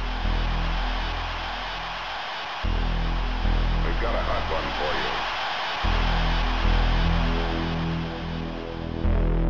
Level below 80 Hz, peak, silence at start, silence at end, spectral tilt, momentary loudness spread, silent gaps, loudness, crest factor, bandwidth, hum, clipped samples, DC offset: -26 dBFS; -12 dBFS; 0 s; 0 s; -6 dB/octave; 6 LU; none; -27 LUFS; 14 dB; 6.8 kHz; none; under 0.1%; 0.5%